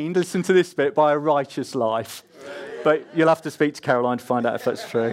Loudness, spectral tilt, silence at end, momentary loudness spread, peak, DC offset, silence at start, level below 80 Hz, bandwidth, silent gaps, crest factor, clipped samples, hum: -22 LUFS; -5.5 dB/octave; 0 s; 11 LU; -6 dBFS; under 0.1%; 0 s; -72 dBFS; 16 kHz; none; 16 dB; under 0.1%; none